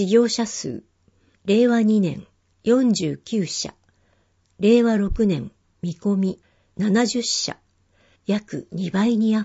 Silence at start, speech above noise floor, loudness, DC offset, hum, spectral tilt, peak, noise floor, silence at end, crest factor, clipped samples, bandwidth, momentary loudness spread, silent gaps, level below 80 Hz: 0 s; 43 dB; -21 LUFS; under 0.1%; none; -5 dB/octave; -4 dBFS; -63 dBFS; 0 s; 18 dB; under 0.1%; 8 kHz; 15 LU; none; -44 dBFS